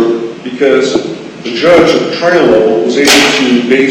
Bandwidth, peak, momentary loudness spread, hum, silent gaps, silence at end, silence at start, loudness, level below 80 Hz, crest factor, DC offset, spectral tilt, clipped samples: 17 kHz; 0 dBFS; 12 LU; none; none; 0 s; 0 s; -8 LUFS; -44 dBFS; 8 dB; under 0.1%; -3.5 dB/octave; 0.4%